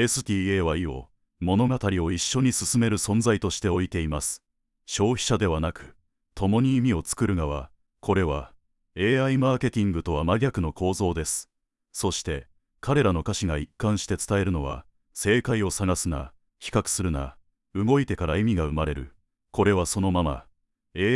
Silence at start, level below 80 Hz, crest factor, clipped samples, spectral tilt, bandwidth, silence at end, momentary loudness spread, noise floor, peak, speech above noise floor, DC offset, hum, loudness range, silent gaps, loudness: 0 s; -42 dBFS; 18 dB; under 0.1%; -5 dB/octave; 12 kHz; 0 s; 12 LU; -47 dBFS; -8 dBFS; 23 dB; under 0.1%; none; 3 LU; none; -25 LUFS